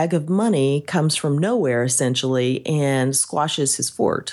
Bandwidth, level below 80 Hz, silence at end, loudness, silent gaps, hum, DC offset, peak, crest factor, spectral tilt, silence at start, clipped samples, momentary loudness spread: 13.5 kHz; -64 dBFS; 0 s; -20 LUFS; none; none; under 0.1%; -6 dBFS; 14 dB; -4.5 dB/octave; 0 s; under 0.1%; 2 LU